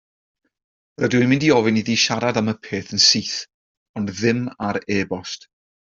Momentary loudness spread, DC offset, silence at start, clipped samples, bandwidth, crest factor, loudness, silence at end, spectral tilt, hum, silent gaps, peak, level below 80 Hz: 14 LU; under 0.1%; 1 s; under 0.1%; 7.6 kHz; 20 dB; -19 LUFS; 0.5 s; -3.5 dB/octave; none; 3.54-3.94 s; -2 dBFS; -58 dBFS